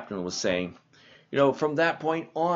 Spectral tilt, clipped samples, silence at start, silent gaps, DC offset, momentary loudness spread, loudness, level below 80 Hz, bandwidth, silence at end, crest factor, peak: -3.5 dB/octave; under 0.1%; 0 s; none; under 0.1%; 8 LU; -27 LUFS; -66 dBFS; 8 kHz; 0 s; 18 dB; -8 dBFS